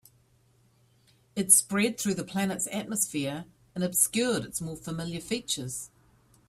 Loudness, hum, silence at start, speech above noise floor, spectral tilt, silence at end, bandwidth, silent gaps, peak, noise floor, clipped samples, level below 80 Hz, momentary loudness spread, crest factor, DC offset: -27 LUFS; none; 1.35 s; 36 dB; -3 dB/octave; 0.6 s; 16 kHz; none; -6 dBFS; -65 dBFS; under 0.1%; -64 dBFS; 17 LU; 24 dB; under 0.1%